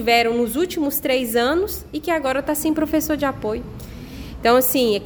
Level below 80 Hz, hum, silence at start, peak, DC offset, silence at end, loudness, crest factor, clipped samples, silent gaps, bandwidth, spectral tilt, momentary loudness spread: -42 dBFS; none; 0 s; -4 dBFS; under 0.1%; 0 s; -20 LUFS; 16 dB; under 0.1%; none; over 20 kHz; -3.5 dB/octave; 16 LU